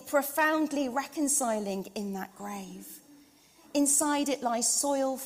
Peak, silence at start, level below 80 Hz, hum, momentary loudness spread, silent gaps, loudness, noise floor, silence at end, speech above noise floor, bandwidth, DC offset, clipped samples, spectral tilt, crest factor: -12 dBFS; 0 s; -72 dBFS; none; 16 LU; none; -28 LUFS; -59 dBFS; 0 s; 29 dB; 16 kHz; under 0.1%; under 0.1%; -2.5 dB/octave; 18 dB